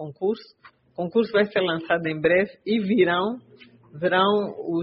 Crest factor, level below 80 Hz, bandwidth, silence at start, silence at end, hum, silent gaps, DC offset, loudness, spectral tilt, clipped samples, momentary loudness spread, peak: 16 dB; -64 dBFS; 5.8 kHz; 0 s; 0 s; none; none; under 0.1%; -23 LUFS; -3.5 dB/octave; under 0.1%; 10 LU; -6 dBFS